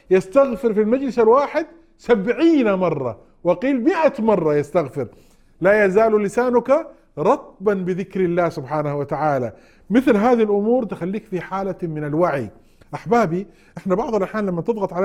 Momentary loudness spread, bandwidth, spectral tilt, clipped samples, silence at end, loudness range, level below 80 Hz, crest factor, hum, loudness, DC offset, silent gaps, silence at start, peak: 11 LU; 13 kHz; -7.5 dB/octave; under 0.1%; 0 s; 4 LU; -52 dBFS; 16 dB; none; -19 LUFS; under 0.1%; none; 0.1 s; -2 dBFS